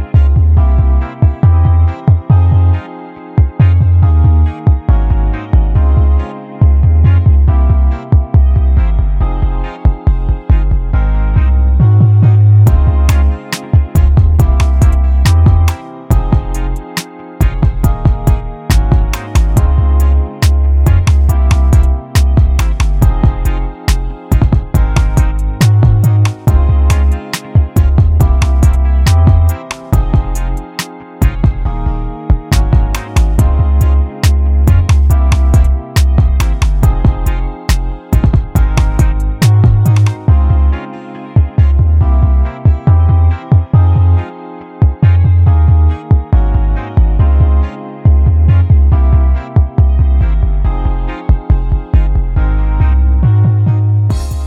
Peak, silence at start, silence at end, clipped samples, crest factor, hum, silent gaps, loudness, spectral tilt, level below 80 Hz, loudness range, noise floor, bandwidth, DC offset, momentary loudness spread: 0 dBFS; 0 s; 0 s; under 0.1%; 8 dB; none; none; -11 LUFS; -7 dB/octave; -12 dBFS; 3 LU; -29 dBFS; 15 kHz; under 0.1%; 7 LU